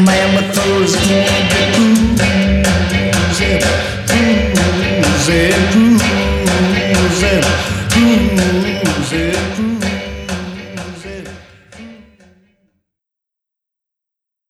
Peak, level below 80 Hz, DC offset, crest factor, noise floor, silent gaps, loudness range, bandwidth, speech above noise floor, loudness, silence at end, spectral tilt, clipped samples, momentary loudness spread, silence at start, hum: 0 dBFS; -26 dBFS; under 0.1%; 14 dB; -82 dBFS; none; 12 LU; 15 kHz; 71 dB; -13 LUFS; 2.55 s; -4.5 dB/octave; under 0.1%; 12 LU; 0 s; none